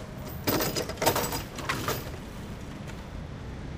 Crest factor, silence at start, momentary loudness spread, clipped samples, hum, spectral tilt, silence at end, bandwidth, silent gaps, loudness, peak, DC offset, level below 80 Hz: 24 dB; 0 s; 13 LU; under 0.1%; none; -4 dB/octave; 0 s; 16 kHz; none; -31 LUFS; -8 dBFS; under 0.1%; -44 dBFS